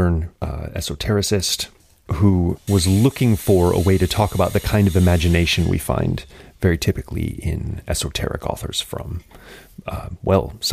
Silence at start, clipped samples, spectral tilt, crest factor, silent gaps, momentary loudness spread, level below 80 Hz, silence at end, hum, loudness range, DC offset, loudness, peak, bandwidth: 0 s; under 0.1%; -5.5 dB/octave; 16 dB; none; 13 LU; -32 dBFS; 0 s; none; 7 LU; under 0.1%; -20 LUFS; -2 dBFS; 15.5 kHz